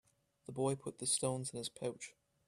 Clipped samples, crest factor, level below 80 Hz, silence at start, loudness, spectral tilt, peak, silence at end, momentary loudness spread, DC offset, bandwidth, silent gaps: under 0.1%; 20 dB; -76 dBFS; 0.5 s; -39 LUFS; -4 dB/octave; -22 dBFS; 0.35 s; 16 LU; under 0.1%; 14.5 kHz; none